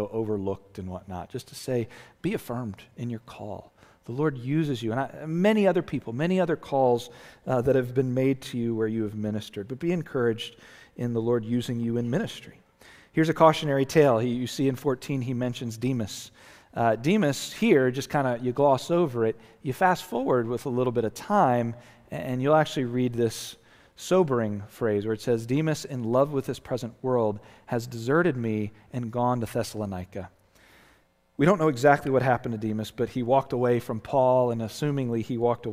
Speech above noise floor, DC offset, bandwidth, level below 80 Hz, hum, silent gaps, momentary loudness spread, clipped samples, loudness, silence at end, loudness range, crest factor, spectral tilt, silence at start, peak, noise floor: 37 dB; under 0.1%; 16 kHz; -58 dBFS; none; none; 15 LU; under 0.1%; -26 LUFS; 0 s; 5 LU; 22 dB; -6.5 dB/octave; 0 s; -4 dBFS; -63 dBFS